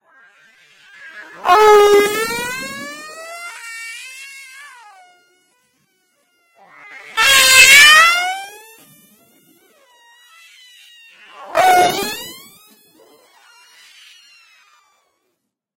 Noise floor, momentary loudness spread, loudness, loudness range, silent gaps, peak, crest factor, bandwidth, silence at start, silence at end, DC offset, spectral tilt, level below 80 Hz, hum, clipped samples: -73 dBFS; 28 LU; -10 LUFS; 22 LU; none; 0 dBFS; 18 dB; 17 kHz; 1.15 s; 3.45 s; under 0.1%; 0.5 dB/octave; -54 dBFS; none; under 0.1%